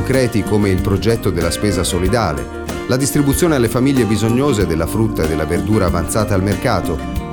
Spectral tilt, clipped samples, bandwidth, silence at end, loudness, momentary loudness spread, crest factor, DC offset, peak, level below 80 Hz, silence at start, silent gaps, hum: -5.5 dB/octave; under 0.1%; over 20 kHz; 0 s; -16 LUFS; 5 LU; 14 dB; under 0.1%; 0 dBFS; -28 dBFS; 0 s; none; none